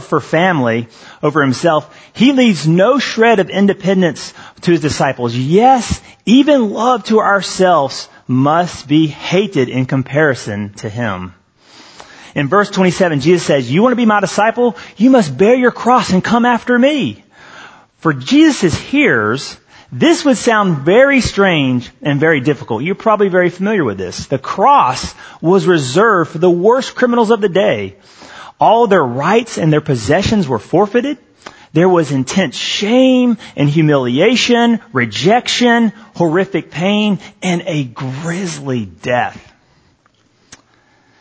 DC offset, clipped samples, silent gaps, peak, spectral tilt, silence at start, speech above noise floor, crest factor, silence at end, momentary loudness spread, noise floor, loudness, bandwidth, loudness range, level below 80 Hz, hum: under 0.1%; under 0.1%; none; 0 dBFS; -5.5 dB/octave; 0 s; 42 dB; 14 dB; 1.85 s; 10 LU; -55 dBFS; -13 LUFS; 8 kHz; 5 LU; -44 dBFS; none